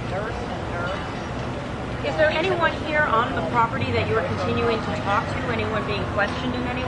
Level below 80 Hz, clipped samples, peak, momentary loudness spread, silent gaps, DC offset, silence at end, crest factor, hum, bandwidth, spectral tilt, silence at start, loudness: -40 dBFS; under 0.1%; -6 dBFS; 9 LU; none; under 0.1%; 0 s; 18 dB; none; 11 kHz; -6 dB/octave; 0 s; -24 LUFS